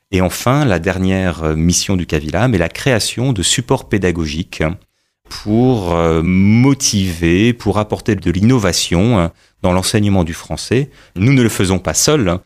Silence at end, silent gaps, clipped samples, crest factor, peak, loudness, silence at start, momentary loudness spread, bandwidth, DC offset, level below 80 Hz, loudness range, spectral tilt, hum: 0.05 s; none; under 0.1%; 12 dB; -2 dBFS; -14 LUFS; 0.1 s; 8 LU; 15.5 kHz; under 0.1%; -34 dBFS; 3 LU; -5 dB/octave; none